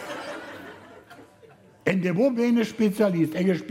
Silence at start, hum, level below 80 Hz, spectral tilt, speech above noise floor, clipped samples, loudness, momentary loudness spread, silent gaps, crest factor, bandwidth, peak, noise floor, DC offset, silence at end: 0 s; none; -66 dBFS; -7 dB/octave; 30 dB; under 0.1%; -24 LUFS; 17 LU; none; 18 dB; 16 kHz; -8 dBFS; -53 dBFS; under 0.1%; 0 s